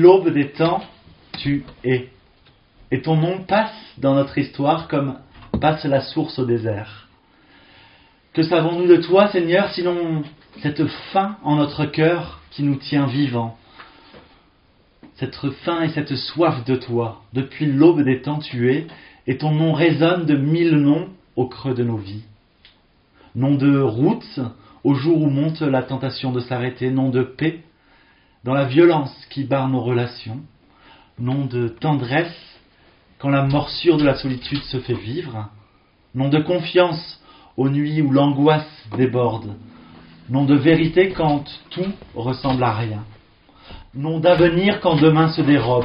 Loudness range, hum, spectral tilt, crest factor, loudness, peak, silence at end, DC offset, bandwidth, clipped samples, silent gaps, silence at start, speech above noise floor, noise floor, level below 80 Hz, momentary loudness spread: 5 LU; none; -6 dB/octave; 20 dB; -19 LUFS; 0 dBFS; 0 s; under 0.1%; 5.4 kHz; under 0.1%; none; 0 s; 38 dB; -56 dBFS; -50 dBFS; 14 LU